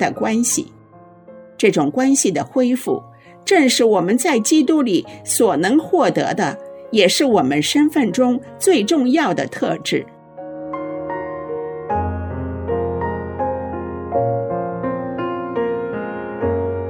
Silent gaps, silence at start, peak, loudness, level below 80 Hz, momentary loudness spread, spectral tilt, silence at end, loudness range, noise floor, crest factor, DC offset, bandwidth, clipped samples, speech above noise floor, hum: none; 0 s; -2 dBFS; -18 LUFS; -46 dBFS; 12 LU; -4 dB/octave; 0 s; 8 LU; -45 dBFS; 18 dB; under 0.1%; 19 kHz; under 0.1%; 28 dB; none